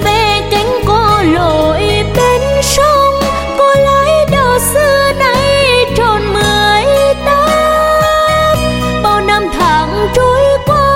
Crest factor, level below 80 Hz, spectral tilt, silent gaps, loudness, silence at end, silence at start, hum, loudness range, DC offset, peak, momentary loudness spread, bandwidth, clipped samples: 10 dB; -24 dBFS; -4 dB/octave; none; -10 LUFS; 0 s; 0 s; none; 1 LU; under 0.1%; 0 dBFS; 3 LU; 16.5 kHz; under 0.1%